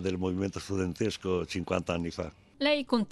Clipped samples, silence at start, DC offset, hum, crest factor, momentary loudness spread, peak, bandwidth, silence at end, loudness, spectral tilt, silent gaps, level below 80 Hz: under 0.1%; 0 s; under 0.1%; none; 20 dB; 6 LU; -12 dBFS; 13.5 kHz; 0 s; -31 LUFS; -5.5 dB/octave; none; -60 dBFS